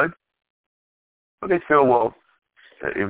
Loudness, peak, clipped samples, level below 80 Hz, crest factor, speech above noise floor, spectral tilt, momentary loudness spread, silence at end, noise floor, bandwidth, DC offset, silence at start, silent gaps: -20 LUFS; -4 dBFS; under 0.1%; -58 dBFS; 20 dB; over 71 dB; -10 dB/octave; 14 LU; 0 s; under -90 dBFS; 4 kHz; under 0.1%; 0 s; 0.50-1.38 s